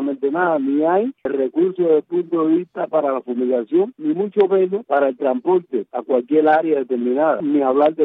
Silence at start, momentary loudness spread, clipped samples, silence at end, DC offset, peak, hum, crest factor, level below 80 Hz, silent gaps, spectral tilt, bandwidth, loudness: 0 s; 6 LU; under 0.1%; 0 s; under 0.1%; -6 dBFS; none; 12 dB; -72 dBFS; none; -10 dB/octave; 4 kHz; -19 LUFS